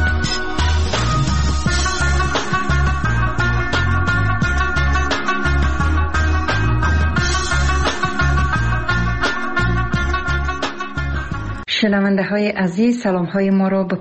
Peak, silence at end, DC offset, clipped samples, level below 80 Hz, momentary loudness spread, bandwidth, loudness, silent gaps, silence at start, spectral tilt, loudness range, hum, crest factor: -4 dBFS; 0 s; 4%; under 0.1%; -22 dBFS; 3 LU; 8.6 kHz; -18 LUFS; none; 0 s; -5.5 dB/octave; 2 LU; none; 12 dB